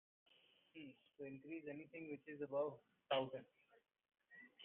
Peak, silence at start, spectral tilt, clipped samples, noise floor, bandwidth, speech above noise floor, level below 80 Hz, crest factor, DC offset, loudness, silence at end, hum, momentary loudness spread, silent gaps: -28 dBFS; 0.75 s; -2.5 dB/octave; under 0.1%; -71 dBFS; 3.8 kHz; 23 dB; under -90 dBFS; 22 dB; under 0.1%; -48 LUFS; 0 s; none; 20 LU; none